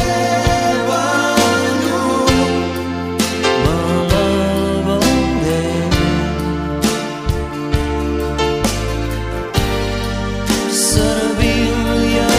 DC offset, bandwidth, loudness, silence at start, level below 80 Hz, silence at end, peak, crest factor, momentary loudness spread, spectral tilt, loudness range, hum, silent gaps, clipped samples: under 0.1%; 16 kHz; -16 LUFS; 0 s; -26 dBFS; 0 s; 0 dBFS; 16 dB; 7 LU; -4.5 dB/octave; 4 LU; none; none; under 0.1%